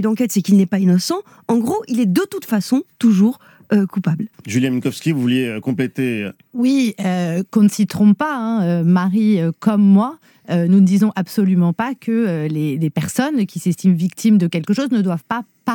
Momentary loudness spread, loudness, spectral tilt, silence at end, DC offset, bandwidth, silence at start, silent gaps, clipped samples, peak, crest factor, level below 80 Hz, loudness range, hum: 7 LU; -17 LUFS; -6.5 dB/octave; 0 s; under 0.1%; 18.5 kHz; 0 s; none; under 0.1%; -2 dBFS; 14 dB; -64 dBFS; 4 LU; none